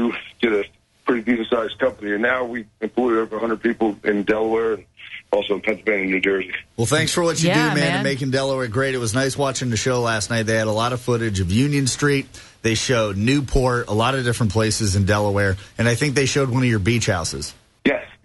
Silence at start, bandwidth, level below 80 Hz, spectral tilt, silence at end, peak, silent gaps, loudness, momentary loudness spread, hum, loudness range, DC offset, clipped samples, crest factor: 0 s; 12 kHz; -40 dBFS; -5 dB/octave; 0.1 s; -6 dBFS; none; -20 LUFS; 6 LU; none; 2 LU; under 0.1%; under 0.1%; 16 dB